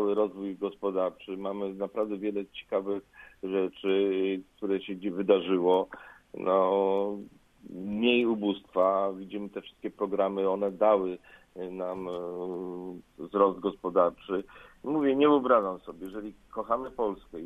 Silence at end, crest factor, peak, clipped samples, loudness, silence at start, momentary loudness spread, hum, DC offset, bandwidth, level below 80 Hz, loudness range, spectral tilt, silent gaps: 0 s; 20 dB; -8 dBFS; under 0.1%; -29 LUFS; 0 s; 16 LU; none; under 0.1%; 4 kHz; -64 dBFS; 4 LU; -7.5 dB/octave; none